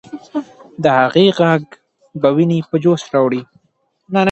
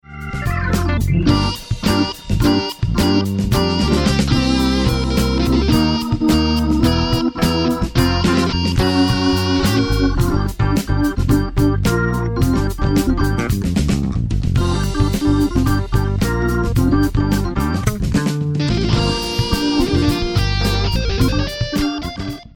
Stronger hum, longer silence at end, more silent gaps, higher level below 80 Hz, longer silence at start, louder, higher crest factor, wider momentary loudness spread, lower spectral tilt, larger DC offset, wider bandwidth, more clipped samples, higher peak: neither; about the same, 0 s vs 0.1 s; neither; second, -60 dBFS vs -24 dBFS; about the same, 0.1 s vs 0.1 s; about the same, -15 LUFS vs -17 LUFS; about the same, 16 dB vs 14 dB; first, 14 LU vs 4 LU; about the same, -7 dB/octave vs -6 dB/octave; neither; second, 8.2 kHz vs 19 kHz; neither; about the same, 0 dBFS vs -2 dBFS